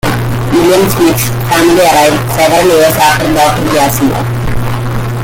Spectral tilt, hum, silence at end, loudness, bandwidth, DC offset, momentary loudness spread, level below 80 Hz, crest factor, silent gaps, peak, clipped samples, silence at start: -5 dB/octave; none; 0 s; -9 LUFS; 17.5 kHz; under 0.1%; 9 LU; -26 dBFS; 8 dB; none; 0 dBFS; under 0.1%; 0.05 s